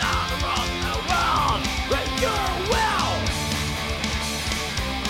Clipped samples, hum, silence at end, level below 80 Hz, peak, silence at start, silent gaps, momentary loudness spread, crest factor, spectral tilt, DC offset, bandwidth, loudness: under 0.1%; none; 0 s; -32 dBFS; -6 dBFS; 0 s; none; 4 LU; 18 dB; -3.5 dB/octave; under 0.1%; 17 kHz; -23 LUFS